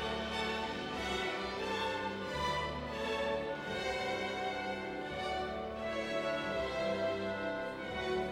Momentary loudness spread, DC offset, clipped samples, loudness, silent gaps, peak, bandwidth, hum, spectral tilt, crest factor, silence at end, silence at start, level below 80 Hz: 3 LU; under 0.1%; under 0.1%; -37 LUFS; none; -24 dBFS; 16 kHz; none; -4.5 dB/octave; 14 dB; 0 s; 0 s; -56 dBFS